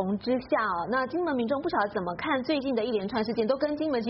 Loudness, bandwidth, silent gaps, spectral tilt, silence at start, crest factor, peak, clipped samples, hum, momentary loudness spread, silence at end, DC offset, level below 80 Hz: -28 LUFS; 5.8 kHz; none; -4 dB/octave; 0 s; 14 dB; -14 dBFS; under 0.1%; none; 2 LU; 0 s; under 0.1%; -60 dBFS